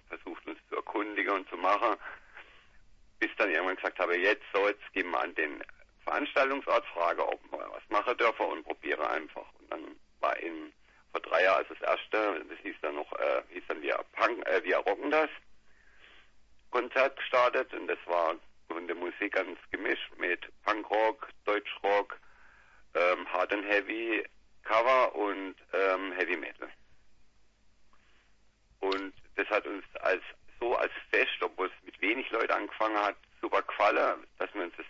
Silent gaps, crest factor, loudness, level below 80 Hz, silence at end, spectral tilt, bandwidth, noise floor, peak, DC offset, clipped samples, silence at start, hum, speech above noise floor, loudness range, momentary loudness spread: none; 20 dB; -31 LUFS; -68 dBFS; 0 s; -3.5 dB/octave; 7.4 kHz; -64 dBFS; -12 dBFS; under 0.1%; under 0.1%; 0.1 s; none; 32 dB; 4 LU; 14 LU